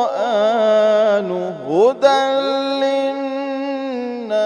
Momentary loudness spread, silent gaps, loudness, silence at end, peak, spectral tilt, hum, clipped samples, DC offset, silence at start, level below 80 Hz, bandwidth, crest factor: 9 LU; none; -17 LUFS; 0 s; 0 dBFS; -5 dB/octave; none; under 0.1%; under 0.1%; 0 s; -72 dBFS; 10 kHz; 16 dB